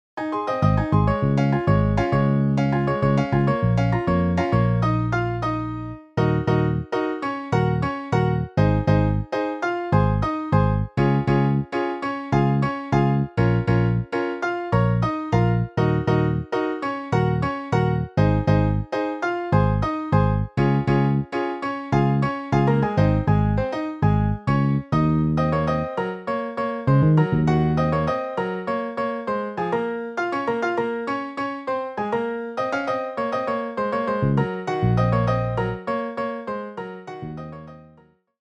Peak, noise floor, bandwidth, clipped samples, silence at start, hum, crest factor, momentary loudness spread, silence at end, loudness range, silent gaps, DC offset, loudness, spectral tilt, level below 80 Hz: -6 dBFS; -55 dBFS; 7.6 kHz; under 0.1%; 0.15 s; none; 16 dB; 7 LU; 0.55 s; 5 LU; none; under 0.1%; -22 LUFS; -8.5 dB/octave; -38 dBFS